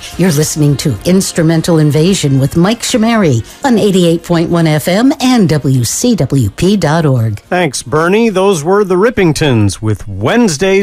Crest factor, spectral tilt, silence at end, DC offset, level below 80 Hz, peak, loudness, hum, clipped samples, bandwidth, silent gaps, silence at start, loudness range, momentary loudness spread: 10 dB; -5.5 dB/octave; 0 s; under 0.1%; -36 dBFS; 0 dBFS; -11 LUFS; none; under 0.1%; 16 kHz; none; 0 s; 1 LU; 4 LU